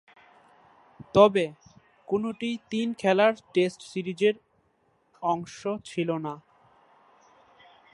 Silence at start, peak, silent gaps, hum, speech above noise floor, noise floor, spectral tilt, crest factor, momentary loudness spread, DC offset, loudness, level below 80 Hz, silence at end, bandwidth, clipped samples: 1.15 s; -4 dBFS; none; none; 43 dB; -68 dBFS; -6 dB/octave; 24 dB; 14 LU; under 0.1%; -26 LUFS; -66 dBFS; 1.55 s; 11.5 kHz; under 0.1%